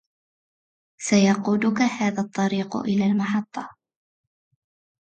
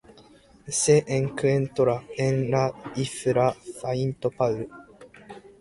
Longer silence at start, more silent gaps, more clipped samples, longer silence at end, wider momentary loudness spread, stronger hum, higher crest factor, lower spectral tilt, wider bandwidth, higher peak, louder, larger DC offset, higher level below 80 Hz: first, 1 s vs 0.65 s; neither; neither; first, 1.35 s vs 0.2 s; about the same, 14 LU vs 13 LU; neither; about the same, 18 dB vs 20 dB; about the same, -5.5 dB/octave vs -5.5 dB/octave; second, 9 kHz vs 11.5 kHz; about the same, -6 dBFS vs -6 dBFS; first, -22 LUFS vs -25 LUFS; neither; second, -66 dBFS vs -58 dBFS